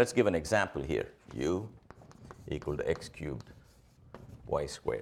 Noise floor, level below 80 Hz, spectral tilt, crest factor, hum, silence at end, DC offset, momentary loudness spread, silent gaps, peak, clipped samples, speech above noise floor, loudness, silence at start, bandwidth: -60 dBFS; -52 dBFS; -5.5 dB/octave; 22 dB; none; 0 s; under 0.1%; 24 LU; none; -12 dBFS; under 0.1%; 27 dB; -34 LUFS; 0 s; 15 kHz